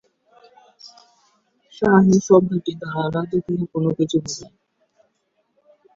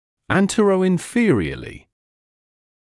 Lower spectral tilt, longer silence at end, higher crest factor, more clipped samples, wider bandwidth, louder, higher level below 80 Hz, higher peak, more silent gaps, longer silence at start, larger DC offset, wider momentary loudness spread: about the same, -6.5 dB/octave vs -6 dB/octave; first, 1.5 s vs 1.05 s; about the same, 20 dB vs 16 dB; neither; second, 7.6 kHz vs 12 kHz; about the same, -19 LUFS vs -19 LUFS; second, -56 dBFS vs -48 dBFS; about the same, -2 dBFS vs -4 dBFS; neither; first, 0.85 s vs 0.3 s; neither; about the same, 12 LU vs 13 LU